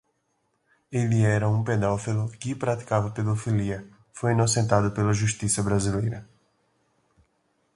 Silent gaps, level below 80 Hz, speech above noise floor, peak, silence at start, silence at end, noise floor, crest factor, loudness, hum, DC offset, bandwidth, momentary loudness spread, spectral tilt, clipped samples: none; -50 dBFS; 49 dB; -4 dBFS; 0.9 s; 1.5 s; -73 dBFS; 22 dB; -25 LUFS; none; under 0.1%; 11.5 kHz; 9 LU; -5.5 dB/octave; under 0.1%